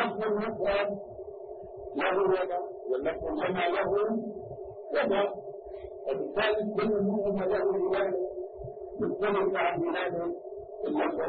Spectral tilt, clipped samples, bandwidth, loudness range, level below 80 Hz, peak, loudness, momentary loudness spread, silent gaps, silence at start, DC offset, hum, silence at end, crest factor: -9.5 dB/octave; under 0.1%; 4.7 kHz; 2 LU; -58 dBFS; -14 dBFS; -30 LUFS; 14 LU; none; 0 s; under 0.1%; none; 0 s; 16 dB